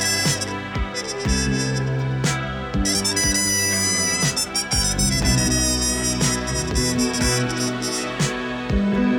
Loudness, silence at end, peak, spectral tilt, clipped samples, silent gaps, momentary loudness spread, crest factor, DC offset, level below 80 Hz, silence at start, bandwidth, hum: -20 LUFS; 0 s; -6 dBFS; -3 dB/octave; under 0.1%; none; 6 LU; 14 dB; under 0.1%; -32 dBFS; 0 s; 20 kHz; none